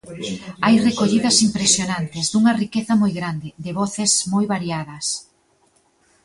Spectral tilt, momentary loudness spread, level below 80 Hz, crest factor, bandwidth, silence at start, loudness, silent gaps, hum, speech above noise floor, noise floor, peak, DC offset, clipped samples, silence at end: -3.5 dB/octave; 13 LU; -56 dBFS; 18 dB; 11.5 kHz; 0.05 s; -19 LUFS; none; none; 41 dB; -60 dBFS; -2 dBFS; under 0.1%; under 0.1%; 1 s